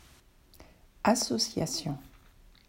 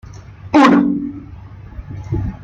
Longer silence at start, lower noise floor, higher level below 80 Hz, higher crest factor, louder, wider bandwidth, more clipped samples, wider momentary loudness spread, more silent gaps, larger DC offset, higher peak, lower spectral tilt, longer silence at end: first, 0.6 s vs 0.05 s; first, -59 dBFS vs -35 dBFS; second, -58 dBFS vs -36 dBFS; first, 22 dB vs 16 dB; second, -30 LUFS vs -14 LUFS; first, 16 kHz vs 8 kHz; neither; second, 11 LU vs 26 LU; neither; neither; second, -12 dBFS vs 0 dBFS; second, -3.5 dB/octave vs -7 dB/octave; first, 0.6 s vs 0 s